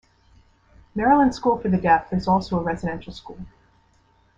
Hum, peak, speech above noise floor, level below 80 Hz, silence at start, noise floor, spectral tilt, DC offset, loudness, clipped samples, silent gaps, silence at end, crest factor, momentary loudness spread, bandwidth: none; -4 dBFS; 39 dB; -46 dBFS; 0.95 s; -60 dBFS; -7.5 dB/octave; under 0.1%; -21 LUFS; under 0.1%; none; 0.9 s; 18 dB; 21 LU; 7.8 kHz